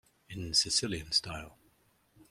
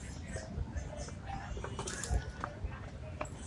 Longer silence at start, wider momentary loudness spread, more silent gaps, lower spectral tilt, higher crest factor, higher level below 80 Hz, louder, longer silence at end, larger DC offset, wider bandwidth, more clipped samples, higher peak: first, 0.3 s vs 0 s; first, 17 LU vs 7 LU; neither; second, -2 dB/octave vs -4.5 dB/octave; about the same, 22 dB vs 22 dB; second, -58 dBFS vs -44 dBFS; first, -29 LUFS vs -42 LUFS; about the same, 0.05 s vs 0 s; neither; first, 16 kHz vs 11.5 kHz; neither; first, -12 dBFS vs -20 dBFS